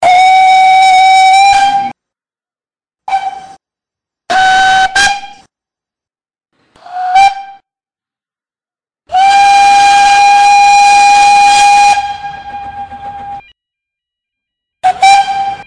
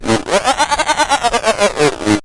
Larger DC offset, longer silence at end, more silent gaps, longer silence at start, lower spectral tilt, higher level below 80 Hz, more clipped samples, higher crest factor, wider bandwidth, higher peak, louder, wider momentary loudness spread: neither; about the same, 0.05 s vs 0 s; neither; about the same, 0 s vs 0 s; second, 0 dB/octave vs -3 dB/octave; second, -44 dBFS vs -38 dBFS; neither; about the same, 10 dB vs 14 dB; about the same, 10.5 kHz vs 11.5 kHz; about the same, 0 dBFS vs 0 dBFS; first, -6 LUFS vs -14 LUFS; first, 19 LU vs 1 LU